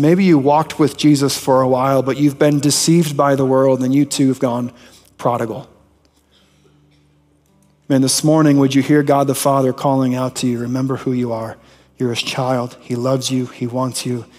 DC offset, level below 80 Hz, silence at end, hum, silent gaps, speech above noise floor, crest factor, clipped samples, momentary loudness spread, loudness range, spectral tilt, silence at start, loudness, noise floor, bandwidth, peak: under 0.1%; -58 dBFS; 0.15 s; none; none; 40 dB; 14 dB; under 0.1%; 10 LU; 8 LU; -5.5 dB/octave; 0 s; -16 LUFS; -55 dBFS; 16 kHz; -2 dBFS